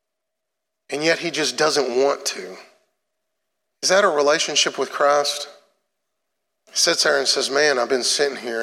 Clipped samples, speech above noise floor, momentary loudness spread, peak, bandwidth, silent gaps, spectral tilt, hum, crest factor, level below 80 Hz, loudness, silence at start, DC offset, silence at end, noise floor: under 0.1%; 62 dB; 10 LU; -4 dBFS; 16.5 kHz; none; -1 dB/octave; none; 18 dB; -84 dBFS; -19 LUFS; 0.9 s; under 0.1%; 0 s; -82 dBFS